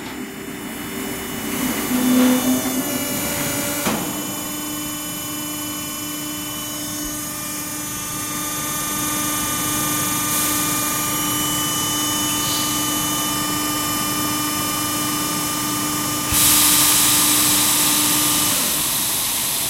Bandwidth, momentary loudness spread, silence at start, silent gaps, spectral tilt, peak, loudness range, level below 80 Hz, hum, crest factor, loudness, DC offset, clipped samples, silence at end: 16 kHz; 12 LU; 0 s; none; -1.5 dB/octave; -2 dBFS; 10 LU; -46 dBFS; none; 18 dB; -18 LUFS; under 0.1%; under 0.1%; 0 s